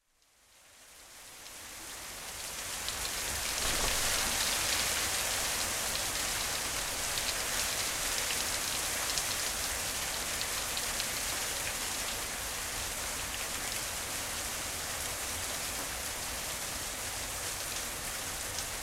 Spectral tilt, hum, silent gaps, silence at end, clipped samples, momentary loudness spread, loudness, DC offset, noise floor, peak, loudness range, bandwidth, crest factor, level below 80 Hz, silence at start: -0.5 dB/octave; none; none; 0 s; under 0.1%; 7 LU; -32 LUFS; under 0.1%; -67 dBFS; -12 dBFS; 5 LU; 16 kHz; 22 dB; -50 dBFS; 0.55 s